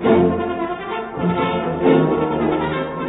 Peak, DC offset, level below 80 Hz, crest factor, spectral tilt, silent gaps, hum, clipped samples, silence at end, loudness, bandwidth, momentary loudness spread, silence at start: -2 dBFS; under 0.1%; -44 dBFS; 16 dB; -12 dB/octave; none; none; under 0.1%; 0 s; -19 LUFS; 4 kHz; 9 LU; 0 s